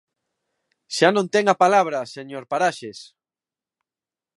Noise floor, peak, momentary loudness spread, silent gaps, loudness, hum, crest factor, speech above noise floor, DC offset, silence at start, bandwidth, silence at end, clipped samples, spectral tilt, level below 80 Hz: under -90 dBFS; -2 dBFS; 18 LU; none; -20 LUFS; none; 22 dB; over 70 dB; under 0.1%; 0.9 s; 11.5 kHz; 1.35 s; under 0.1%; -4 dB/octave; -76 dBFS